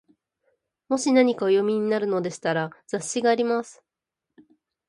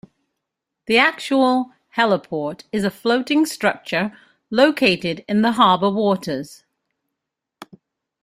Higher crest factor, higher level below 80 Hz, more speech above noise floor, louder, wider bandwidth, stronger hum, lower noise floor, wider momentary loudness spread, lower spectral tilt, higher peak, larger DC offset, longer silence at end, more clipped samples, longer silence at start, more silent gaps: about the same, 20 dB vs 20 dB; second, -74 dBFS vs -62 dBFS; about the same, 63 dB vs 63 dB; second, -24 LUFS vs -19 LUFS; second, 11.5 kHz vs 15.5 kHz; neither; first, -86 dBFS vs -82 dBFS; second, 9 LU vs 12 LU; about the same, -4.5 dB/octave vs -5 dB/octave; second, -6 dBFS vs -2 dBFS; neither; first, 1.15 s vs 0.6 s; neither; about the same, 0.9 s vs 0.9 s; neither